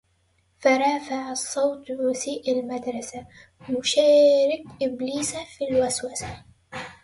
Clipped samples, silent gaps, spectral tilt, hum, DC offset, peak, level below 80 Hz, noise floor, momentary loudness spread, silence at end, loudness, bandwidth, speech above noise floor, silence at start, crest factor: under 0.1%; none; -3 dB/octave; none; under 0.1%; -6 dBFS; -58 dBFS; -66 dBFS; 19 LU; 0.1 s; -23 LUFS; 11.5 kHz; 43 dB; 0.6 s; 18 dB